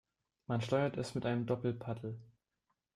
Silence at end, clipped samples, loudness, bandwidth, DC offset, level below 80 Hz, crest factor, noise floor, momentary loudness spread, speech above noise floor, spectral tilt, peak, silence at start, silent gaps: 0.7 s; under 0.1%; -37 LUFS; 12 kHz; under 0.1%; -70 dBFS; 18 dB; -85 dBFS; 12 LU; 49 dB; -7 dB/octave; -20 dBFS; 0.5 s; none